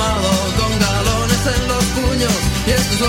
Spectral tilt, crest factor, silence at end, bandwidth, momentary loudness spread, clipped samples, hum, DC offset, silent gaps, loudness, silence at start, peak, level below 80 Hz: -4 dB/octave; 12 dB; 0 s; 16.5 kHz; 1 LU; under 0.1%; none; under 0.1%; none; -16 LUFS; 0 s; -4 dBFS; -24 dBFS